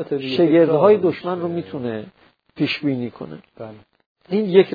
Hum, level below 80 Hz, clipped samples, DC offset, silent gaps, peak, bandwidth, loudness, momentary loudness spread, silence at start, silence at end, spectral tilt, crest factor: none; -66 dBFS; under 0.1%; under 0.1%; 4.06-4.15 s; 0 dBFS; 5 kHz; -19 LUFS; 22 LU; 0 s; 0 s; -9 dB/octave; 18 dB